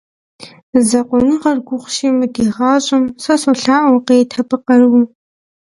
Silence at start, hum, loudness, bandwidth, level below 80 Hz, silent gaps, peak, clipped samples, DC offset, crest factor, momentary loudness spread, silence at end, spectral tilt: 0.4 s; none; -13 LUFS; 11.5 kHz; -50 dBFS; 0.63-0.73 s; 0 dBFS; under 0.1%; under 0.1%; 14 dB; 7 LU; 0.6 s; -4 dB/octave